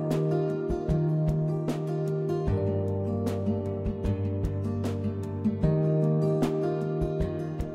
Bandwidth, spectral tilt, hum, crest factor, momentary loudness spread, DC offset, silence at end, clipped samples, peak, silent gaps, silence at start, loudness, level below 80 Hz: 11 kHz; -9.5 dB/octave; none; 16 dB; 5 LU; under 0.1%; 0 s; under 0.1%; -10 dBFS; none; 0 s; -28 LUFS; -42 dBFS